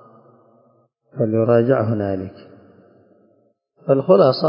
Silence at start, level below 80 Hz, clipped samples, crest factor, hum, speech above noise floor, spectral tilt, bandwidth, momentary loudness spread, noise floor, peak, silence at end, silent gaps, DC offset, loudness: 1.15 s; -54 dBFS; under 0.1%; 18 dB; none; 45 dB; -12 dB/octave; 5.4 kHz; 19 LU; -61 dBFS; -2 dBFS; 0 s; none; under 0.1%; -18 LUFS